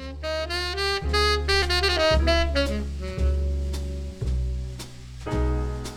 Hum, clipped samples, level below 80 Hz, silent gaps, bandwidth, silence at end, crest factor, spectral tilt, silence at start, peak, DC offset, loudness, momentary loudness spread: none; under 0.1%; -28 dBFS; none; 14 kHz; 0 s; 16 dB; -4.5 dB/octave; 0 s; -8 dBFS; under 0.1%; -25 LUFS; 12 LU